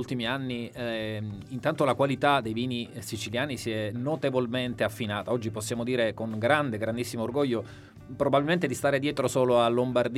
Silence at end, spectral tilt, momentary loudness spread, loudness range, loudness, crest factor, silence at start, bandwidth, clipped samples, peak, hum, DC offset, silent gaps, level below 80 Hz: 0 s; -5.5 dB/octave; 10 LU; 3 LU; -28 LUFS; 22 dB; 0 s; 16 kHz; under 0.1%; -6 dBFS; none; under 0.1%; none; -60 dBFS